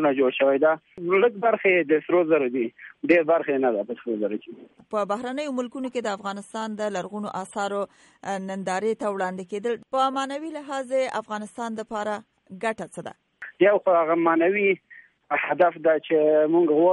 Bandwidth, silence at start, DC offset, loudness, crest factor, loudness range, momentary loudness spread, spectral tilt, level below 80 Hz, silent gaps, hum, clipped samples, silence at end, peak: 11.5 kHz; 0 s; under 0.1%; -24 LUFS; 18 dB; 8 LU; 13 LU; -5.5 dB/octave; -74 dBFS; none; none; under 0.1%; 0 s; -6 dBFS